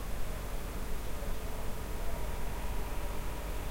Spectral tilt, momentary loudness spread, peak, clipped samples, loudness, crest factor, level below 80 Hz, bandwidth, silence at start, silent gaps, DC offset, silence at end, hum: -5 dB/octave; 1 LU; -22 dBFS; under 0.1%; -41 LUFS; 12 dB; -38 dBFS; 16 kHz; 0 s; none; under 0.1%; 0 s; none